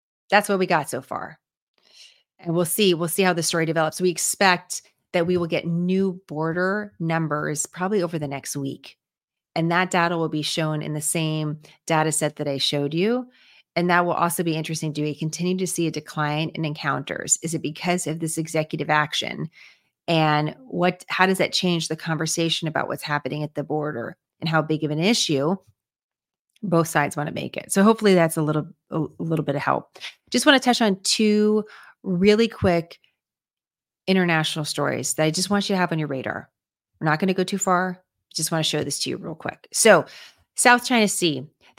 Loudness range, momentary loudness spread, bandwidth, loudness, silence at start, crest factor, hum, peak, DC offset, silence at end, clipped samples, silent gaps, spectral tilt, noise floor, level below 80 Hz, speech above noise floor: 4 LU; 12 LU; 16.5 kHz; -22 LUFS; 0.3 s; 22 dB; none; 0 dBFS; under 0.1%; 0.3 s; under 0.1%; 1.57-1.74 s, 9.24-9.28 s, 26.03-26.09 s, 26.39-26.45 s; -4 dB/octave; under -90 dBFS; -64 dBFS; over 68 dB